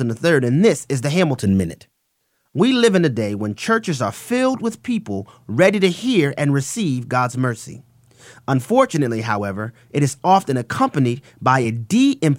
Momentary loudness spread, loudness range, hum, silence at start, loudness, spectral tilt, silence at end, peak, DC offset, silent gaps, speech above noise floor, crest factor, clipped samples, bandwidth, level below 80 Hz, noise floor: 9 LU; 2 LU; none; 0 s; -19 LUFS; -6 dB/octave; 0 s; -2 dBFS; under 0.1%; none; 51 dB; 18 dB; under 0.1%; 16 kHz; -58 dBFS; -69 dBFS